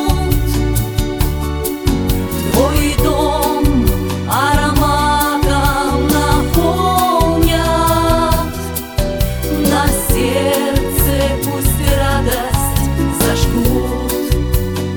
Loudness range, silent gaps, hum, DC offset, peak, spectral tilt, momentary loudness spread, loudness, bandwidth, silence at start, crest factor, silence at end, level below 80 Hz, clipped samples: 2 LU; none; none; under 0.1%; 0 dBFS; -5 dB/octave; 5 LU; -15 LUFS; over 20 kHz; 0 s; 14 dB; 0 s; -20 dBFS; under 0.1%